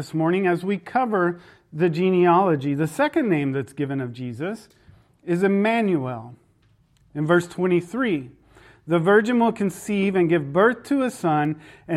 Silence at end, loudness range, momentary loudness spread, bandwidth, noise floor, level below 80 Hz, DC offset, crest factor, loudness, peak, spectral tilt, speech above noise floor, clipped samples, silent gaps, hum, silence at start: 0 s; 4 LU; 13 LU; 13.5 kHz; -60 dBFS; -64 dBFS; under 0.1%; 16 dB; -22 LUFS; -6 dBFS; -7 dB/octave; 39 dB; under 0.1%; none; none; 0 s